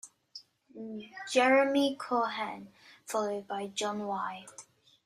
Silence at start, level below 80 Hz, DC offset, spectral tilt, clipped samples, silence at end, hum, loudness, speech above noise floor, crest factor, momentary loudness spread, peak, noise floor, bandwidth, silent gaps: 0.05 s; -80 dBFS; under 0.1%; -3.5 dB/octave; under 0.1%; 0.45 s; none; -30 LUFS; 23 dB; 18 dB; 25 LU; -14 dBFS; -54 dBFS; 15 kHz; none